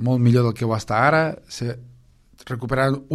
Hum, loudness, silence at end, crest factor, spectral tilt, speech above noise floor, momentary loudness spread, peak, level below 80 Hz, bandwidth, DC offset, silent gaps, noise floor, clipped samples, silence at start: none; -21 LUFS; 0 s; 18 dB; -7 dB/octave; 32 dB; 14 LU; -4 dBFS; -48 dBFS; 12.5 kHz; under 0.1%; none; -52 dBFS; under 0.1%; 0 s